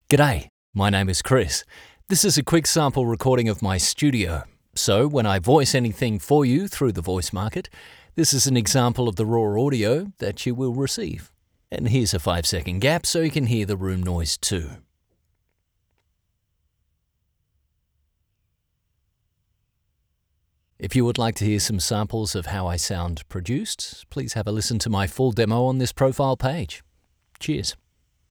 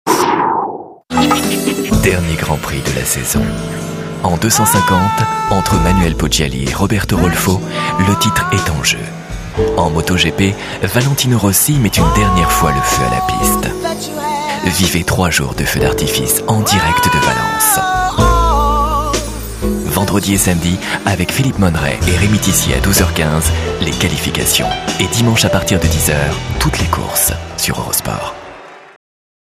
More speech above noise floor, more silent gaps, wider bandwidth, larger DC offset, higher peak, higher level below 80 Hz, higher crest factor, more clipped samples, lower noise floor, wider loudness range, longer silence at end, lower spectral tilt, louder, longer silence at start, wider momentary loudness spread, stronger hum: first, 51 dB vs 21 dB; first, 0.49-0.73 s vs none; first, over 20 kHz vs 16 kHz; neither; about the same, 0 dBFS vs 0 dBFS; second, -46 dBFS vs -24 dBFS; first, 24 dB vs 14 dB; neither; first, -73 dBFS vs -34 dBFS; first, 6 LU vs 2 LU; about the same, 0.55 s vs 0.55 s; about the same, -4.5 dB/octave vs -4 dB/octave; second, -22 LUFS vs -13 LUFS; about the same, 0.1 s vs 0.05 s; first, 11 LU vs 7 LU; neither